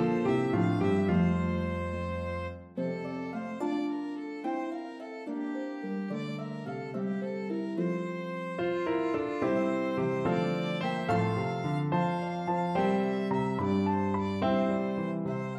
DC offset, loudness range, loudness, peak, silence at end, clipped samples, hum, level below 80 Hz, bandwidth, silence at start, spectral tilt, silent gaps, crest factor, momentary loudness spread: under 0.1%; 6 LU; -31 LUFS; -16 dBFS; 0 s; under 0.1%; none; -56 dBFS; 9 kHz; 0 s; -8 dB/octave; none; 16 dB; 9 LU